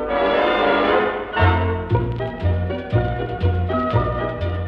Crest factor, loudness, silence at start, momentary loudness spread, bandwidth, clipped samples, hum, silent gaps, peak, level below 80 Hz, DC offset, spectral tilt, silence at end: 16 dB; -20 LUFS; 0 s; 7 LU; 5.4 kHz; under 0.1%; none; none; -4 dBFS; -32 dBFS; under 0.1%; -9 dB/octave; 0 s